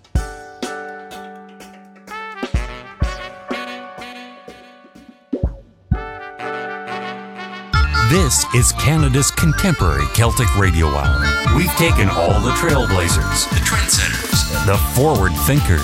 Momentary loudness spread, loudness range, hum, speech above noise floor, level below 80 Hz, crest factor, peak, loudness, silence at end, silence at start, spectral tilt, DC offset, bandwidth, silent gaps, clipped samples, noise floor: 17 LU; 13 LU; none; 29 dB; -24 dBFS; 14 dB; -4 dBFS; -17 LUFS; 0 s; 0.15 s; -4 dB/octave; under 0.1%; 16.5 kHz; none; under 0.1%; -44 dBFS